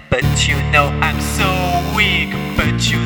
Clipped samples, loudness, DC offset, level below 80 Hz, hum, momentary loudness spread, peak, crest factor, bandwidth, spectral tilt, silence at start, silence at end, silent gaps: under 0.1%; -15 LUFS; under 0.1%; -26 dBFS; none; 4 LU; 0 dBFS; 16 dB; over 20 kHz; -4.5 dB/octave; 0 s; 0 s; none